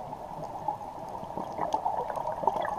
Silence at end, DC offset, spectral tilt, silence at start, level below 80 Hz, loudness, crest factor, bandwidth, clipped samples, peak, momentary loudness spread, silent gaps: 0 s; under 0.1%; -5.5 dB/octave; 0 s; -58 dBFS; -34 LUFS; 22 dB; 15 kHz; under 0.1%; -10 dBFS; 9 LU; none